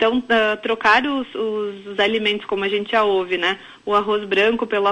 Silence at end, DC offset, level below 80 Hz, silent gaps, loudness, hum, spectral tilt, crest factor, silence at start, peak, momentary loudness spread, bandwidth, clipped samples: 0 s; under 0.1%; -56 dBFS; none; -19 LUFS; none; -4.5 dB/octave; 16 dB; 0 s; -4 dBFS; 8 LU; 10.5 kHz; under 0.1%